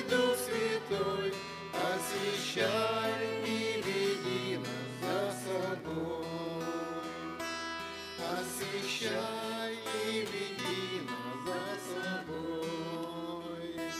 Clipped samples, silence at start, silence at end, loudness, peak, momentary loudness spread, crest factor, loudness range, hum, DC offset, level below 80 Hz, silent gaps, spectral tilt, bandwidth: under 0.1%; 0 s; 0 s; -35 LUFS; -18 dBFS; 8 LU; 18 dB; 5 LU; none; under 0.1%; -70 dBFS; none; -3.5 dB/octave; 15.5 kHz